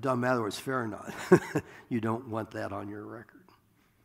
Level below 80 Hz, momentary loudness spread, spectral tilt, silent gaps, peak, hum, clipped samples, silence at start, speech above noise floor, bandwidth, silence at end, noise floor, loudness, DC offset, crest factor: -70 dBFS; 16 LU; -6.5 dB/octave; none; -8 dBFS; none; under 0.1%; 0 s; 35 dB; 16 kHz; 0.65 s; -66 dBFS; -31 LUFS; under 0.1%; 24 dB